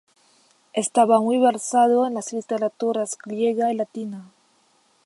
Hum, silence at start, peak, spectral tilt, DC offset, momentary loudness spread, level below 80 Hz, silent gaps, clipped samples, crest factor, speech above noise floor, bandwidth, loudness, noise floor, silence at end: none; 0.75 s; -4 dBFS; -4.5 dB/octave; under 0.1%; 12 LU; -80 dBFS; none; under 0.1%; 18 dB; 41 dB; 11.5 kHz; -21 LUFS; -62 dBFS; 0.8 s